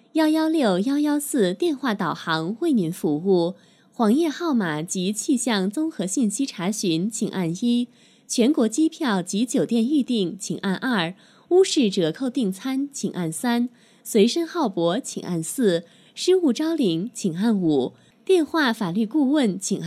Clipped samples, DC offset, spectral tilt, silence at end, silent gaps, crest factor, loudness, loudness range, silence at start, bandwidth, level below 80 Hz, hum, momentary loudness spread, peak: under 0.1%; under 0.1%; -5 dB/octave; 0 s; none; 16 dB; -23 LUFS; 2 LU; 0.15 s; 15 kHz; -74 dBFS; none; 7 LU; -6 dBFS